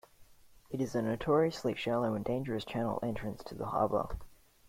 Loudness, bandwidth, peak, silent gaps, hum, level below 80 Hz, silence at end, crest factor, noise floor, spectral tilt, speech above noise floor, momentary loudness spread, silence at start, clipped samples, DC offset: -34 LUFS; 16.5 kHz; -16 dBFS; none; none; -54 dBFS; 0.35 s; 18 dB; -59 dBFS; -7 dB/octave; 25 dB; 12 LU; 0.2 s; under 0.1%; under 0.1%